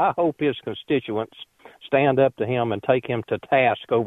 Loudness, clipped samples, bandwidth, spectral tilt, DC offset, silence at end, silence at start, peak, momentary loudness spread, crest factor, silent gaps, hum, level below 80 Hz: -22 LUFS; under 0.1%; 4 kHz; -8.5 dB/octave; under 0.1%; 0 s; 0 s; -4 dBFS; 10 LU; 18 dB; none; none; -60 dBFS